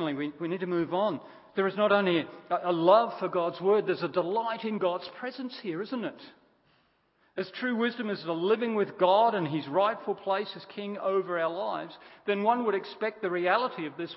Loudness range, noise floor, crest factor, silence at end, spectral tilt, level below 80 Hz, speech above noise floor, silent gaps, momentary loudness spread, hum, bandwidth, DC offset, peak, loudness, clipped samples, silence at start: 8 LU; -69 dBFS; 20 dB; 0 s; -9.5 dB/octave; -80 dBFS; 40 dB; none; 13 LU; none; 5.8 kHz; under 0.1%; -10 dBFS; -29 LUFS; under 0.1%; 0 s